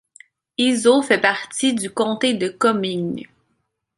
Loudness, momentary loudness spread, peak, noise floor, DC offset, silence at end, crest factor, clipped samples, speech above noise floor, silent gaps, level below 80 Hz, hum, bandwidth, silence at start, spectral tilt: -19 LUFS; 11 LU; -2 dBFS; -71 dBFS; under 0.1%; 0.7 s; 18 dB; under 0.1%; 52 dB; none; -64 dBFS; none; 11.5 kHz; 0.6 s; -3.5 dB/octave